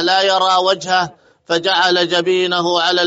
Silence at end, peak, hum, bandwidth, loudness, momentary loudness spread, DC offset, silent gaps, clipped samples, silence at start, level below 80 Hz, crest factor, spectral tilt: 0 s; -2 dBFS; none; 8 kHz; -15 LUFS; 5 LU; under 0.1%; none; under 0.1%; 0 s; -64 dBFS; 14 dB; -0.5 dB/octave